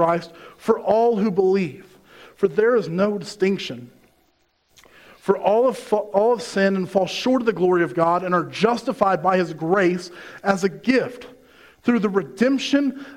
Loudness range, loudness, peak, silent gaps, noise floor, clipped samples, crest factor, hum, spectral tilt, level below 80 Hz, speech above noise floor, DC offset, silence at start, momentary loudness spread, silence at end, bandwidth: 4 LU; -21 LUFS; -4 dBFS; none; -64 dBFS; under 0.1%; 18 dB; none; -6 dB/octave; -62 dBFS; 44 dB; under 0.1%; 0 s; 9 LU; 0 s; 15.5 kHz